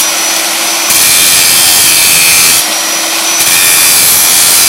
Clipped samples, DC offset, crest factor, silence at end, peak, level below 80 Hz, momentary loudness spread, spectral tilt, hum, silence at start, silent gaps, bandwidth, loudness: 4%; under 0.1%; 6 dB; 0 s; 0 dBFS; -44 dBFS; 6 LU; 1.5 dB/octave; none; 0 s; none; over 20 kHz; -4 LUFS